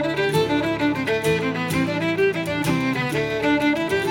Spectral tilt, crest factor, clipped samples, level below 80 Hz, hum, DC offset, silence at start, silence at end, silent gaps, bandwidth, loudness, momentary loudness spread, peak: -5.5 dB/octave; 14 dB; under 0.1%; -48 dBFS; none; under 0.1%; 0 s; 0 s; none; 17 kHz; -21 LUFS; 3 LU; -8 dBFS